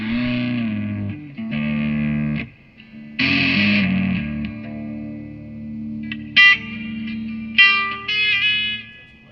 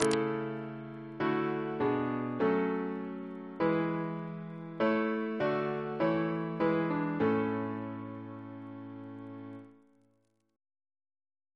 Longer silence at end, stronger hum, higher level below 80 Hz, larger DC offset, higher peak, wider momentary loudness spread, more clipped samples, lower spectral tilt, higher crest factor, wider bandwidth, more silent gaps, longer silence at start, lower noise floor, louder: second, 0.25 s vs 1.8 s; neither; first, -48 dBFS vs -72 dBFS; neither; first, 0 dBFS vs -6 dBFS; first, 19 LU vs 15 LU; neither; about the same, -6 dB/octave vs -6.5 dB/octave; second, 20 dB vs 28 dB; second, 6.6 kHz vs 11 kHz; neither; about the same, 0 s vs 0 s; second, -44 dBFS vs -74 dBFS; first, -18 LUFS vs -33 LUFS